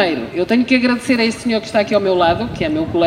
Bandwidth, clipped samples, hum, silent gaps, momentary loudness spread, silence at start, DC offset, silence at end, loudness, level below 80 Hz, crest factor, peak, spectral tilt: 12.5 kHz; under 0.1%; none; none; 6 LU; 0 s; under 0.1%; 0 s; -16 LUFS; -42 dBFS; 16 dB; 0 dBFS; -5.5 dB/octave